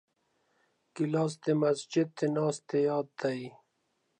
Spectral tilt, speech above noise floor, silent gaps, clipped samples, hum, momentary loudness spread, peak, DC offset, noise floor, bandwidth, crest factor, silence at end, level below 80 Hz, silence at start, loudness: -6.5 dB/octave; 47 dB; none; under 0.1%; none; 8 LU; -16 dBFS; under 0.1%; -77 dBFS; 10.5 kHz; 16 dB; 0.7 s; -84 dBFS; 0.95 s; -31 LUFS